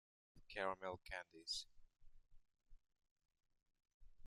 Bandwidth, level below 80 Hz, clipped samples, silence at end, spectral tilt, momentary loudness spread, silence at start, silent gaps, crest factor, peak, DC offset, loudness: 12.5 kHz; -70 dBFS; under 0.1%; 0 s; -2 dB/octave; 8 LU; 0.35 s; 3.11-3.16 s, 3.94-4.00 s; 26 dB; -28 dBFS; under 0.1%; -49 LUFS